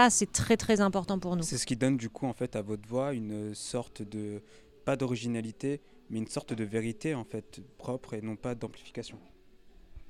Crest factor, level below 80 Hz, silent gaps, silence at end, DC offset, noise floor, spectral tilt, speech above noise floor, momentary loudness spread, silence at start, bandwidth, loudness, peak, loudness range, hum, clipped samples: 24 dB; -56 dBFS; none; 0 s; under 0.1%; -56 dBFS; -4.5 dB/octave; 24 dB; 14 LU; 0 s; 15.5 kHz; -33 LUFS; -8 dBFS; 7 LU; none; under 0.1%